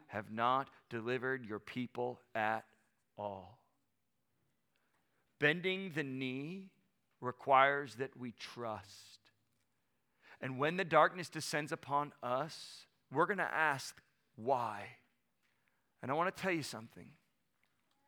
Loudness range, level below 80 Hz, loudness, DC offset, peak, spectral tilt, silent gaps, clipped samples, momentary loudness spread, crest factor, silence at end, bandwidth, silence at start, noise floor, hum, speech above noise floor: 7 LU; -84 dBFS; -37 LUFS; under 0.1%; -14 dBFS; -4.5 dB/octave; none; under 0.1%; 17 LU; 26 dB; 1 s; 18 kHz; 0.1 s; -85 dBFS; none; 48 dB